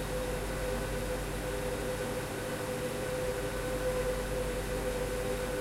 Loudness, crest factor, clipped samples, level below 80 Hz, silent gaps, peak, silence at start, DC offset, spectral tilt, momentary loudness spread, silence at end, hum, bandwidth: -35 LUFS; 12 dB; under 0.1%; -42 dBFS; none; -22 dBFS; 0 s; under 0.1%; -4.5 dB/octave; 2 LU; 0 s; none; 16 kHz